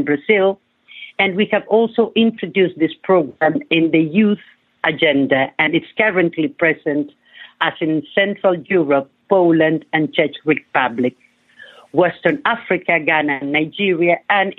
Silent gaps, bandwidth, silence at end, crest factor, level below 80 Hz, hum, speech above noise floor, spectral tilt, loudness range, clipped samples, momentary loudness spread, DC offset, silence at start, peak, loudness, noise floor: none; 4.2 kHz; 0.05 s; 16 dB; -66 dBFS; none; 28 dB; -8.5 dB/octave; 2 LU; under 0.1%; 6 LU; under 0.1%; 0 s; -2 dBFS; -17 LUFS; -45 dBFS